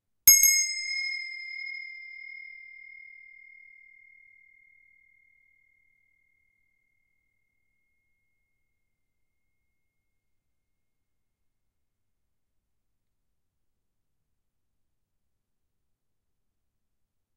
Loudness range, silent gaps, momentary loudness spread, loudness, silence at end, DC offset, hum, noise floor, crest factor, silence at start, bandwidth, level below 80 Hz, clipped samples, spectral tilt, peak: 28 LU; none; 29 LU; -22 LUFS; 14.8 s; under 0.1%; none; -82 dBFS; 32 dB; 0.25 s; 8.2 kHz; -68 dBFS; under 0.1%; 4 dB/octave; -2 dBFS